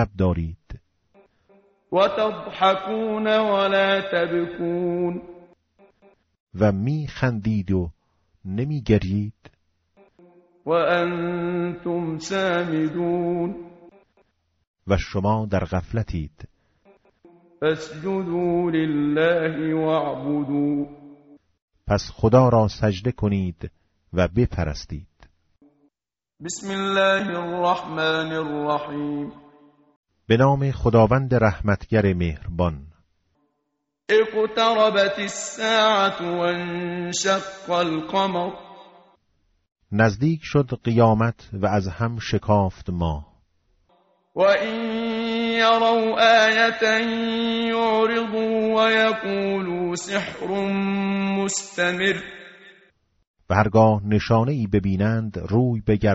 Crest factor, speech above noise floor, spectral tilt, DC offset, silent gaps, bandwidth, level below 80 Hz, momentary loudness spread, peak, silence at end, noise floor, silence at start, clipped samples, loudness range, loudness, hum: 20 dB; over 69 dB; -4.5 dB/octave; under 0.1%; 6.40-6.47 s, 14.67-14.74 s, 21.62-21.68 s, 29.96-30.03 s, 53.27-53.34 s; 8 kHz; -44 dBFS; 10 LU; -2 dBFS; 0 s; under -90 dBFS; 0 s; under 0.1%; 7 LU; -22 LUFS; none